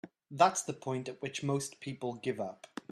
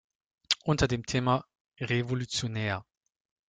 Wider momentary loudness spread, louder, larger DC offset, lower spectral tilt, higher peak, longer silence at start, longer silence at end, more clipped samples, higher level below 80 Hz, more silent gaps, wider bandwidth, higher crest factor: first, 13 LU vs 6 LU; second, -34 LUFS vs -30 LUFS; neither; about the same, -4.5 dB/octave vs -4.5 dB/octave; second, -12 dBFS vs -8 dBFS; second, 0.05 s vs 0.5 s; second, 0.1 s vs 0.7 s; neither; second, -76 dBFS vs -50 dBFS; second, none vs 1.60-1.65 s; first, 13 kHz vs 9.4 kHz; about the same, 24 dB vs 24 dB